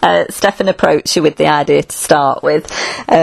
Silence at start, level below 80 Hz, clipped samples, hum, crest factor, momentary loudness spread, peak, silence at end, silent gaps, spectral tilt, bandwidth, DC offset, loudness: 0 s; -46 dBFS; 0.2%; none; 12 dB; 4 LU; 0 dBFS; 0 s; none; -4 dB/octave; 14.5 kHz; under 0.1%; -13 LUFS